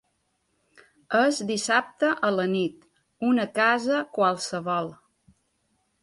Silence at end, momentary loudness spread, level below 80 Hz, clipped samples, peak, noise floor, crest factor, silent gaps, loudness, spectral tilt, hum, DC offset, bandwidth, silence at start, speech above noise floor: 1.1 s; 8 LU; -72 dBFS; under 0.1%; -8 dBFS; -73 dBFS; 18 dB; none; -25 LUFS; -4 dB/octave; none; under 0.1%; 11.5 kHz; 1.1 s; 49 dB